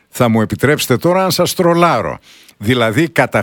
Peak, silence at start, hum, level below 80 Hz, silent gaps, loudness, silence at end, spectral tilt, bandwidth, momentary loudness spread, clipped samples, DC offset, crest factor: 0 dBFS; 0.15 s; none; -46 dBFS; none; -14 LUFS; 0 s; -5 dB/octave; 19 kHz; 7 LU; under 0.1%; under 0.1%; 14 dB